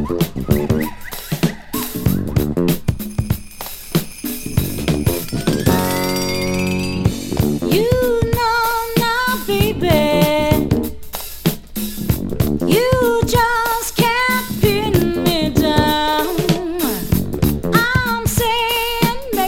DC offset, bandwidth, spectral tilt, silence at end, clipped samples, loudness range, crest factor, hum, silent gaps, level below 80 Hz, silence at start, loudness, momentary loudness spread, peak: under 0.1%; 17 kHz; -5 dB/octave; 0 s; under 0.1%; 5 LU; 16 dB; none; none; -30 dBFS; 0 s; -17 LUFS; 7 LU; 0 dBFS